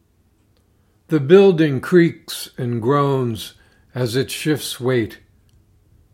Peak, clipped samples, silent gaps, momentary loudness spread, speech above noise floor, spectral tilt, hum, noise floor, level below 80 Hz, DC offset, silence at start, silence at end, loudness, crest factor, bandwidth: 0 dBFS; under 0.1%; none; 17 LU; 42 dB; -6 dB/octave; none; -59 dBFS; -60 dBFS; under 0.1%; 1.1 s; 1 s; -18 LUFS; 20 dB; 16.5 kHz